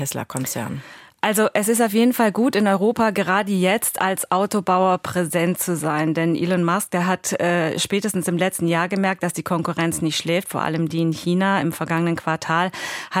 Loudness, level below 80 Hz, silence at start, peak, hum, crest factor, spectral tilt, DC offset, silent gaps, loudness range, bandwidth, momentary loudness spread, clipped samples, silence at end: -20 LUFS; -62 dBFS; 0 s; -4 dBFS; none; 16 dB; -4.5 dB/octave; under 0.1%; none; 3 LU; 16.5 kHz; 6 LU; under 0.1%; 0 s